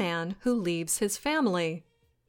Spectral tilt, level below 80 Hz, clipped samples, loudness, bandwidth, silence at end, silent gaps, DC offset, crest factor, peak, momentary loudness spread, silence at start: -4 dB/octave; -60 dBFS; under 0.1%; -29 LUFS; 17 kHz; 0.45 s; none; under 0.1%; 14 dB; -16 dBFS; 5 LU; 0 s